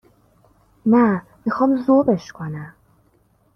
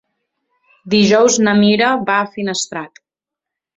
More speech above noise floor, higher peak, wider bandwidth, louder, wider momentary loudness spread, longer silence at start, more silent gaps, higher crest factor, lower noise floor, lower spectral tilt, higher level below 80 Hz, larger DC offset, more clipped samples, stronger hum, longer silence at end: second, 42 dB vs 71 dB; second, -4 dBFS vs 0 dBFS; second, 6.6 kHz vs 8 kHz; second, -19 LUFS vs -14 LUFS; first, 15 LU vs 12 LU; about the same, 0.85 s vs 0.85 s; neither; about the same, 16 dB vs 16 dB; second, -60 dBFS vs -85 dBFS; first, -8.5 dB/octave vs -4 dB/octave; about the same, -58 dBFS vs -58 dBFS; neither; neither; neither; about the same, 0.85 s vs 0.9 s